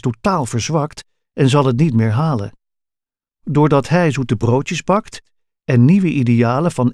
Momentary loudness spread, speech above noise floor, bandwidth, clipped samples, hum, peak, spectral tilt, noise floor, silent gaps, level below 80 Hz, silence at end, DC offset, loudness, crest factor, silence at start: 11 LU; 72 dB; 11.5 kHz; under 0.1%; none; 0 dBFS; -7 dB/octave; -87 dBFS; none; -48 dBFS; 0 s; under 0.1%; -16 LUFS; 16 dB; 0.05 s